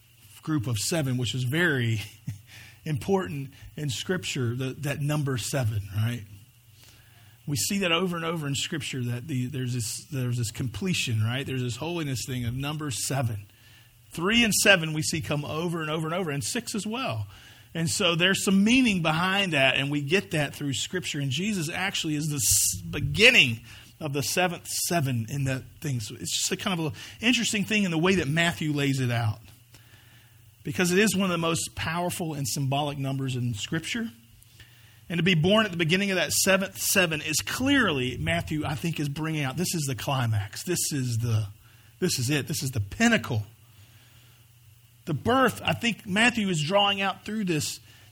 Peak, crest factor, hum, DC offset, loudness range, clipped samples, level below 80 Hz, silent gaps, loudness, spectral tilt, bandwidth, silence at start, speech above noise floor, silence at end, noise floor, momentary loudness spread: -2 dBFS; 24 dB; none; under 0.1%; 7 LU; under 0.1%; -54 dBFS; none; -26 LUFS; -4 dB/octave; 20 kHz; 0.35 s; 29 dB; 0.35 s; -55 dBFS; 11 LU